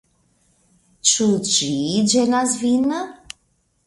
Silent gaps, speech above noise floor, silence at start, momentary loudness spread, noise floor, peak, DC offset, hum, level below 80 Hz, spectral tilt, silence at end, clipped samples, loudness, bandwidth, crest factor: none; 47 dB; 1.05 s; 19 LU; -65 dBFS; -2 dBFS; under 0.1%; none; -58 dBFS; -3 dB/octave; 0.7 s; under 0.1%; -18 LUFS; 11.5 kHz; 20 dB